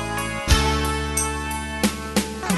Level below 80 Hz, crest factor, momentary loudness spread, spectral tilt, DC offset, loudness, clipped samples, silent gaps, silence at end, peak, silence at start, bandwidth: -28 dBFS; 20 dB; 7 LU; -3.5 dB/octave; under 0.1%; -23 LUFS; under 0.1%; none; 0 s; -2 dBFS; 0 s; 12.5 kHz